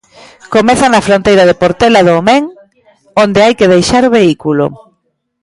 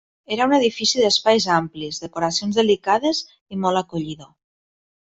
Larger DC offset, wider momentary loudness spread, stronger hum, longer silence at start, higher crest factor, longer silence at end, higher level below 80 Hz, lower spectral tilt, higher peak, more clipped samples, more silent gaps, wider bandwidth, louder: neither; second, 7 LU vs 12 LU; neither; first, 0.5 s vs 0.3 s; second, 10 dB vs 18 dB; about the same, 0.7 s vs 0.8 s; first, -38 dBFS vs -60 dBFS; first, -5 dB/octave vs -3.5 dB/octave; first, 0 dBFS vs -4 dBFS; neither; second, none vs 3.41-3.46 s; first, 11.5 kHz vs 8.4 kHz; first, -8 LUFS vs -20 LUFS